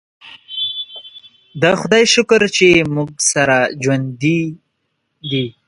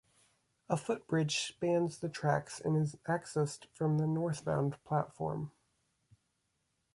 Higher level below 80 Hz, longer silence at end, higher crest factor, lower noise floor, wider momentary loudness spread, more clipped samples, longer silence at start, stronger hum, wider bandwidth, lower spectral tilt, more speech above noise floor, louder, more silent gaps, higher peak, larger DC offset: first, -52 dBFS vs -68 dBFS; second, 0.2 s vs 1.45 s; about the same, 16 dB vs 18 dB; second, -70 dBFS vs -81 dBFS; first, 16 LU vs 6 LU; neither; second, 0.25 s vs 0.7 s; neither; about the same, 11 kHz vs 11.5 kHz; second, -3.5 dB/octave vs -6 dB/octave; first, 55 dB vs 47 dB; first, -14 LUFS vs -35 LUFS; neither; first, 0 dBFS vs -18 dBFS; neither